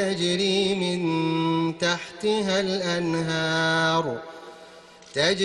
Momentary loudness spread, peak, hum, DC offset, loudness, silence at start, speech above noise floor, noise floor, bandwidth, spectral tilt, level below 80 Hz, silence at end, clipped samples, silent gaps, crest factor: 10 LU; -8 dBFS; none; under 0.1%; -24 LUFS; 0 s; 24 dB; -48 dBFS; 11 kHz; -4.5 dB/octave; -62 dBFS; 0 s; under 0.1%; none; 16 dB